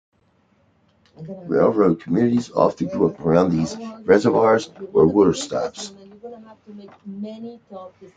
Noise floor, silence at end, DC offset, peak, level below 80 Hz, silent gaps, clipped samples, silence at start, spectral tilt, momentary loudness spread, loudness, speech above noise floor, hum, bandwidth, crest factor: -62 dBFS; 0.1 s; under 0.1%; 0 dBFS; -56 dBFS; none; under 0.1%; 1.2 s; -6.5 dB/octave; 23 LU; -19 LUFS; 42 dB; none; 9.4 kHz; 20 dB